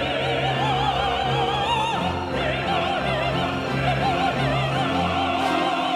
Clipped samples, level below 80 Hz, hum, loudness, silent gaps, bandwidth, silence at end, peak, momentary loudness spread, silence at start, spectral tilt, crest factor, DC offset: under 0.1%; -40 dBFS; none; -22 LUFS; none; 14 kHz; 0 s; -10 dBFS; 2 LU; 0 s; -5.5 dB/octave; 12 dB; under 0.1%